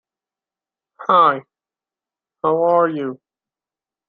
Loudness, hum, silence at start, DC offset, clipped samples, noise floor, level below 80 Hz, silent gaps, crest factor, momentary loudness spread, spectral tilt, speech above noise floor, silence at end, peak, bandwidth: -17 LUFS; none; 1 s; under 0.1%; under 0.1%; under -90 dBFS; -72 dBFS; none; 20 dB; 14 LU; -8 dB/octave; over 74 dB; 0.95 s; -2 dBFS; 4.9 kHz